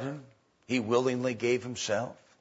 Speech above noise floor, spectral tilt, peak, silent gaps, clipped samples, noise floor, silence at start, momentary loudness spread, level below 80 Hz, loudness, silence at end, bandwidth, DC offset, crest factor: 27 dB; -4.5 dB/octave; -12 dBFS; none; under 0.1%; -57 dBFS; 0 s; 12 LU; -72 dBFS; -31 LUFS; 0.3 s; 8 kHz; under 0.1%; 18 dB